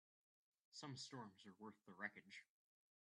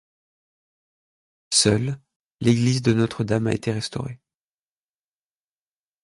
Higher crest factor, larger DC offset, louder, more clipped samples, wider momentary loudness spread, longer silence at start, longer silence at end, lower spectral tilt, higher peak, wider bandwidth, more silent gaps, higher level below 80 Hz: about the same, 26 dB vs 22 dB; neither; second, -57 LUFS vs -22 LUFS; neither; second, 9 LU vs 13 LU; second, 0.7 s vs 1.5 s; second, 0.6 s vs 1.9 s; about the same, -3.5 dB/octave vs -4.5 dB/octave; second, -34 dBFS vs -4 dBFS; about the same, 10.5 kHz vs 11.5 kHz; second, none vs 2.16-2.38 s; second, under -90 dBFS vs -54 dBFS